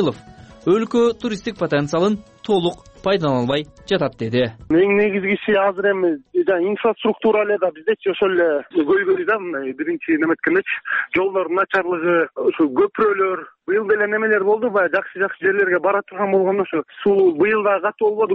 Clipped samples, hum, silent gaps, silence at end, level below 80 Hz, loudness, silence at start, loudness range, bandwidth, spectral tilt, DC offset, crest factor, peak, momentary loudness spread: under 0.1%; none; none; 0 s; -56 dBFS; -19 LUFS; 0 s; 2 LU; 8.4 kHz; -6.5 dB/octave; under 0.1%; 12 dB; -6 dBFS; 6 LU